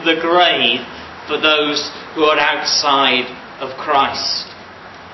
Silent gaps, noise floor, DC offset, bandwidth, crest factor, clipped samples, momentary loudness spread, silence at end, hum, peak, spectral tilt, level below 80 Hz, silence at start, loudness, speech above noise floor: none; -36 dBFS; under 0.1%; 6.2 kHz; 16 dB; under 0.1%; 19 LU; 0 s; none; 0 dBFS; -2 dB/octave; -54 dBFS; 0 s; -15 LUFS; 20 dB